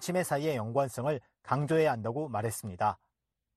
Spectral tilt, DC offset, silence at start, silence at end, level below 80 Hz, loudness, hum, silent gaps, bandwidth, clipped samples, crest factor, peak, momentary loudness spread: -6 dB/octave; under 0.1%; 0 s; 0.6 s; -68 dBFS; -32 LUFS; none; none; 13.5 kHz; under 0.1%; 18 dB; -14 dBFS; 7 LU